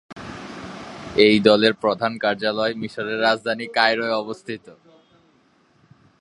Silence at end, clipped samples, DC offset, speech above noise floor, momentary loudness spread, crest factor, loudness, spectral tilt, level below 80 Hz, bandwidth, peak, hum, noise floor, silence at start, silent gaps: 1.5 s; under 0.1%; under 0.1%; 39 dB; 20 LU; 22 dB; -20 LUFS; -5 dB/octave; -58 dBFS; 11 kHz; 0 dBFS; none; -59 dBFS; 0.1 s; none